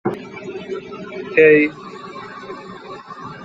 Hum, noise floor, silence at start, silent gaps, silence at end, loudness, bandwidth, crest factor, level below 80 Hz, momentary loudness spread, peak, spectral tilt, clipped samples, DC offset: none; -35 dBFS; 0.05 s; none; 0 s; -16 LUFS; 7.6 kHz; 18 dB; -60 dBFS; 23 LU; -2 dBFS; -7 dB/octave; under 0.1%; under 0.1%